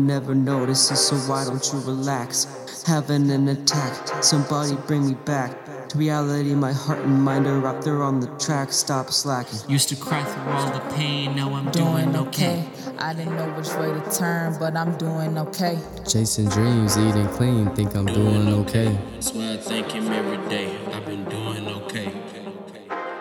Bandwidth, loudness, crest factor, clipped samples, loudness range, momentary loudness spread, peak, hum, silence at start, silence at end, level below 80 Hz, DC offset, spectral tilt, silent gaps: 18 kHz; -23 LUFS; 20 dB; under 0.1%; 4 LU; 10 LU; -2 dBFS; none; 0 s; 0 s; -52 dBFS; under 0.1%; -4.5 dB/octave; none